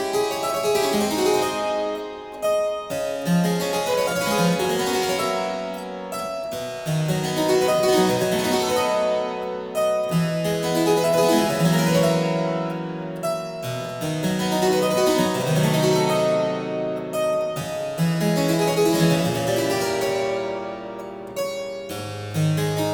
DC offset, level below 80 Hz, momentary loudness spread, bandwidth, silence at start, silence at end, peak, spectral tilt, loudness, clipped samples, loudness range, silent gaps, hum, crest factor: under 0.1%; -56 dBFS; 10 LU; over 20 kHz; 0 s; 0 s; -6 dBFS; -5 dB/octave; -22 LUFS; under 0.1%; 3 LU; none; none; 16 dB